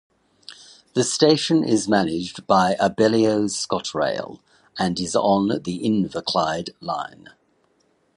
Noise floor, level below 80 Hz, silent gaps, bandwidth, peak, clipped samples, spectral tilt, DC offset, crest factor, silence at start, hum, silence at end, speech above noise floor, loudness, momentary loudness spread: -64 dBFS; -56 dBFS; none; 11 kHz; -2 dBFS; under 0.1%; -4.5 dB/octave; under 0.1%; 20 dB; 0.5 s; none; 1.1 s; 43 dB; -21 LUFS; 12 LU